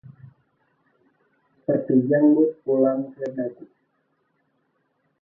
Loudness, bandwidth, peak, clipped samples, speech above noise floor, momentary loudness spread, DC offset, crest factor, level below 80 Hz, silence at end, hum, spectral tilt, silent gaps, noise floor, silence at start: -22 LUFS; 2.1 kHz; -8 dBFS; under 0.1%; 50 dB; 14 LU; under 0.1%; 18 dB; -72 dBFS; 1.6 s; none; -11.5 dB/octave; none; -70 dBFS; 0.25 s